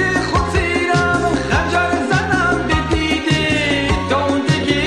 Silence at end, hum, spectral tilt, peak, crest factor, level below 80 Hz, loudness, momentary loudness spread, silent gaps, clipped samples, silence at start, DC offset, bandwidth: 0 s; none; -5 dB/octave; -2 dBFS; 14 dB; -30 dBFS; -16 LUFS; 2 LU; none; under 0.1%; 0 s; 0.2%; 12.5 kHz